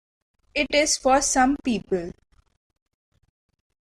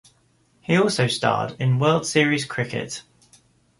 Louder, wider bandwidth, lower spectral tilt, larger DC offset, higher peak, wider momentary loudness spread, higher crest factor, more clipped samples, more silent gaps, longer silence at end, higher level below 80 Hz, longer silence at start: about the same, -22 LUFS vs -21 LUFS; first, 15.5 kHz vs 11.5 kHz; second, -2.5 dB/octave vs -5 dB/octave; neither; second, -8 dBFS vs -4 dBFS; about the same, 10 LU vs 12 LU; about the same, 18 dB vs 20 dB; neither; neither; first, 1.7 s vs 0.8 s; first, -48 dBFS vs -60 dBFS; second, 0.55 s vs 0.7 s